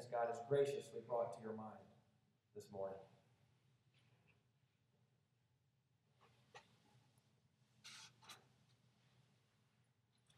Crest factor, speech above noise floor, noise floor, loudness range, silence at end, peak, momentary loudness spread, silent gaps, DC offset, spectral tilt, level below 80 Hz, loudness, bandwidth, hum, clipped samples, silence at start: 24 dB; 38 dB; -82 dBFS; 19 LU; 2 s; -26 dBFS; 24 LU; none; under 0.1%; -5.5 dB/octave; under -90 dBFS; -45 LUFS; 13 kHz; none; under 0.1%; 0 s